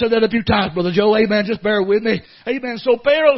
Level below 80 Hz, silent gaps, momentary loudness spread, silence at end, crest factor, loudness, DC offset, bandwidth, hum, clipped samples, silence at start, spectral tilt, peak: -46 dBFS; none; 8 LU; 0 s; 16 dB; -17 LUFS; under 0.1%; 6 kHz; none; under 0.1%; 0 s; -8 dB/octave; 0 dBFS